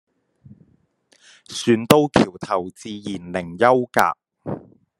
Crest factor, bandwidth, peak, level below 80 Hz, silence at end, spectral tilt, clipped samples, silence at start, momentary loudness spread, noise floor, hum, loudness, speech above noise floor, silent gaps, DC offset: 22 dB; 12.5 kHz; 0 dBFS; -56 dBFS; 0.4 s; -5 dB/octave; under 0.1%; 1.5 s; 17 LU; -61 dBFS; none; -19 LUFS; 41 dB; none; under 0.1%